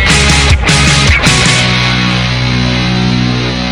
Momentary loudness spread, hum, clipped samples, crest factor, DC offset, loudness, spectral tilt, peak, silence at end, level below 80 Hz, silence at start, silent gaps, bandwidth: 5 LU; none; 0.5%; 10 dB; under 0.1%; -8 LUFS; -3.5 dB/octave; 0 dBFS; 0 s; -18 dBFS; 0 s; none; 13.5 kHz